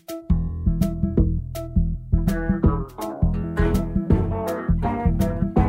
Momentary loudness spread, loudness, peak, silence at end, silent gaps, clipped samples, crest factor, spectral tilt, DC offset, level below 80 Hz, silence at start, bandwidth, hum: 4 LU; -23 LUFS; -6 dBFS; 0 s; none; under 0.1%; 14 dB; -8.5 dB/octave; under 0.1%; -26 dBFS; 0.1 s; 16 kHz; none